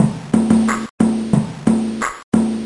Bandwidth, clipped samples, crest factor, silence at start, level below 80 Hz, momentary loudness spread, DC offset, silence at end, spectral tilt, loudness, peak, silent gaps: 11.5 kHz; under 0.1%; 16 dB; 0 s; -48 dBFS; 5 LU; under 0.1%; 0 s; -6.5 dB/octave; -17 LUFS; -2 dBFS; 0.90-0.98 s, 2.23-2.32 s